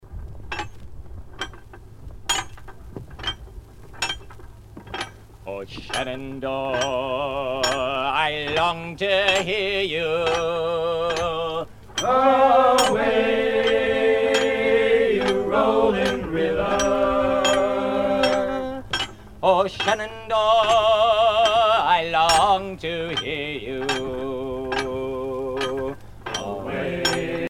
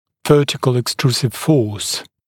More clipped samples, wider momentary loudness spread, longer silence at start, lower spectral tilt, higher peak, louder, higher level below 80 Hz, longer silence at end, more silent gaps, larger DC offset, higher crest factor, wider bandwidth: neither; first, 15 LU vs 6 LU; second, 0.05 s vs 0.25 s; second, -3.5 dB/octave vs -5 dB/octave; second, -4 dBFS vs 0 dBFS; second, -21 LUFS vs -17 LUFS; first, -44 dBFS vs -52 dBFS; second, 0 s vs 0.25 s; neither; neither; about the same, 18 dB vs 16 dB; about the same, 16 kHz vs 17.5 kHz